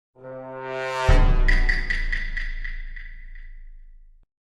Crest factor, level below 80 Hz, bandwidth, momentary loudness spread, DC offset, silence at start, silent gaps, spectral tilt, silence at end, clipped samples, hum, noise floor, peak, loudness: 18 dB; -24 dBFS; 7.8 kHz; 22 LU; under 0.1%; 0.2 s; none; -5.5 dB/octave; 0.55 s; under 0.1%; none; -46 dBFS; -4 dBFS; -25 LUFS